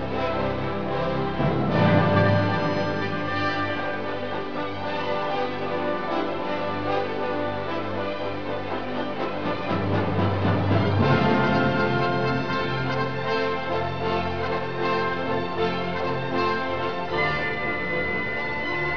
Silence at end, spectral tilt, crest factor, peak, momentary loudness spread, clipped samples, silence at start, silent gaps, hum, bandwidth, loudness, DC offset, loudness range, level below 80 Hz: 0 s; -7.5 dB/octave; 18 dB; -6 dBFS; 8 LU; under 0.1%; 0 s; none; none; 5.4 kHz; -25 LUFS; 2%; 5 LU; -48 dBFS